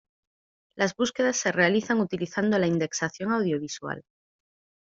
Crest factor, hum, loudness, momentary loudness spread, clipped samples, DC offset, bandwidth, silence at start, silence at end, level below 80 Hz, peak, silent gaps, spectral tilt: 20 dB; none; -26 LUFS; 10 LU; under 0.1%; under 0.1%; 7.8 kHz; 0.75 s; 0.85 s; -66 dBFS; -6 dBFS; none; -4.5 dB/octave